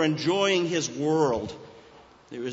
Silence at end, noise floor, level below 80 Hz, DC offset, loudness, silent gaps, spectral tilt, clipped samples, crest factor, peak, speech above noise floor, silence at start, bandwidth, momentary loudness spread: 0 s; -52 dBFS; -60 dBFS; under 0.1%; -25 LUFS; none; -4.5 dB/octave; under 0.1%; 16 dB; -10 dBFS; 27 dB; 0 s; 8 kHz; 17 LU